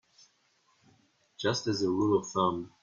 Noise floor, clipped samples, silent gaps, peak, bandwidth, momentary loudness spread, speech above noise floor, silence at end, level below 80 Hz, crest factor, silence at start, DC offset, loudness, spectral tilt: -70 dBFS; under 0.1%; none; -14 dBFS; 7.4 kHz; 4 LU; 41 dB; 0.15 s; -66 dBFS; 18 dB; 1.4 s; under 0.1%; -30 LUFS; -5 dB/octave